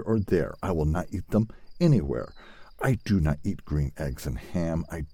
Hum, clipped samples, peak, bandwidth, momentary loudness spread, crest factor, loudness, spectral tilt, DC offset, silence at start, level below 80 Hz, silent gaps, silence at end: none; under 0.1%; -10 dBFS; 16.5 kHz; 9 LU; 18 dB; -28 LUFS; -8 dB/octave; under 0.1%; 0 s; -40 dBFS; none; 0 s